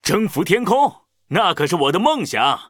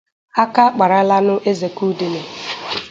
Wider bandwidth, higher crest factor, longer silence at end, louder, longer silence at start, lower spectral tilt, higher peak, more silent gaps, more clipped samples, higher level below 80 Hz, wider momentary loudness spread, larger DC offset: first, over 20 kHz vs 7.8 kHz; about the same, 18 dB vs 16 dB; about the same, 0.05 s vs 0 s; about the same, -18 LUFS vs -17 LUFS; second, 0.05 s vs 0.35 s; about the same, -4.5 dB/octave vs -5.5 dB/octave; about the same, 0 dBFS vs 0 dBFS; neither; neither; first, -54 dBFS vs -62 dBFS; second, 3 LU vs 12 LU; neither